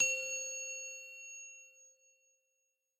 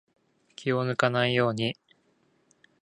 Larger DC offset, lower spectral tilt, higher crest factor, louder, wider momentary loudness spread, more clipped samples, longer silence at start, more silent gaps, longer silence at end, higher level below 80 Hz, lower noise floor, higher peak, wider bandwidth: neither; second, 2.5 dB/octave vs -6 dB/octave; about the same, 22 dB vs 24 dB; second, -39 LUFS vs -27 LUFS; first, 18 LU vs 9 LU; neither; second, 0 s vs 0.6 s; neither; about the same, 1.1 s vs 1.1 s; second, under -90 dBFS vs -68 dBFS; first, -83 dBFS vs -68 dBFS; second, -20 dBFS vs -6 dBFS; first, 15.5 kHz vs 11 kHz